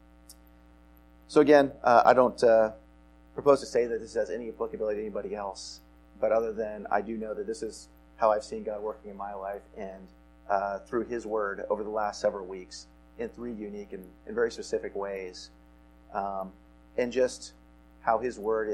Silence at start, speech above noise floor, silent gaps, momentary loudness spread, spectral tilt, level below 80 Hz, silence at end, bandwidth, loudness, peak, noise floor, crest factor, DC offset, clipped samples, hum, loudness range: 0.3 s; 28 dB; none; 20 LU; -5 dB/octave; -56 dBFS; 0 s; 12.5 kHz; -29 LUFS; -6 dBFS; -56 dBFS; 24 dB; under 0.1%; under 0.1%; none; 11 LU